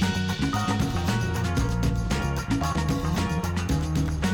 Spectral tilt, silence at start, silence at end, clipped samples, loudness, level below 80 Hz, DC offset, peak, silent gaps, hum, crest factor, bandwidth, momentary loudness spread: -5.5 dB/octave; 0 s; 0 s; under 0.1%; -26 LUFS; -34 dBFS; under 0.1%; -12 dBFS; none; none; 12 dB; 18 kHz; 2 LU